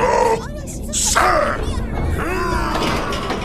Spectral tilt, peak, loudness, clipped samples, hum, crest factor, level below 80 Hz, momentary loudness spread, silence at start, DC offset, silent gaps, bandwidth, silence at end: -3.5 dB/octave; -2 dBFS; -19 LUFS; under 0.1%; none; 16 dB; -28 dBFS; 9 LU; 0 s; under 0.1%; none; 15.5 kHz; 0 s